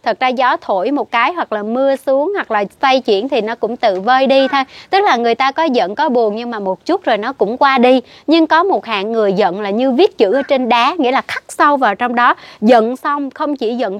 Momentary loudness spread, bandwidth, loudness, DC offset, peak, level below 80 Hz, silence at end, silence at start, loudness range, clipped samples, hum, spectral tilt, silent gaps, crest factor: 7 LU; 13.5 kHz; -14 LUFS; under 0.1%; 0 dBFS; -64 dBFS; 0 s; 0.05 s; 2 LU; under 0.1%; none; -5 dB/octave; none; 14 dB